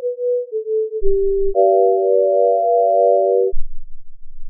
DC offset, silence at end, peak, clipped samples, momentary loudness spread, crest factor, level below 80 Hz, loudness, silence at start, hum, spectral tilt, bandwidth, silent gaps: under 0.1%; 0 s; -2 dBFS; under 0.1%; 8 LU; 12 dB; -28 dBFS; -16 LUFS; 0 s; none; 4 dB/octave; 0.8 kHz; none